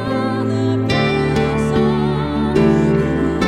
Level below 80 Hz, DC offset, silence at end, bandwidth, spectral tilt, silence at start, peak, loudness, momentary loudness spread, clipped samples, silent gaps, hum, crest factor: -32 dBFS; under 0.1%; 0 s; 11 kHz; -7.5 dB/octave; 0 s; -2 dBFS; -17 LUFS; 5 LU; under 0.1%; none; none; 14 dB